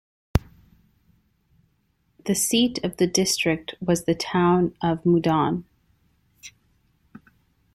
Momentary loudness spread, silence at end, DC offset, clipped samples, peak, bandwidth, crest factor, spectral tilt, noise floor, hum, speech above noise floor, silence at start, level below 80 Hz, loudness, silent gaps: 14 LU; 1.25 s; under 0.1%; under 0.1%; -2 dBFS; 14.5 kHz; 22 dB; -4.5 dB/octave; -68 dBFS; none; 46 dB; 0.35 s; -44 dBFS; -23 LUFS; none